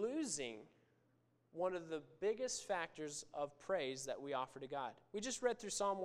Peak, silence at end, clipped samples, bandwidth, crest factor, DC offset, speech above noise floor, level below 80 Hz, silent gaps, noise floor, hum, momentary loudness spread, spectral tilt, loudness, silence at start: -24 dBFS; 0 s; under 0.1%; 15.5 kHz; 20 dB; under 0.1%; 34 dB; -76 dBFS; none; -77 dBFS; none; 7 LU; -2.5 dB/octave; -43 LUFS; 0 s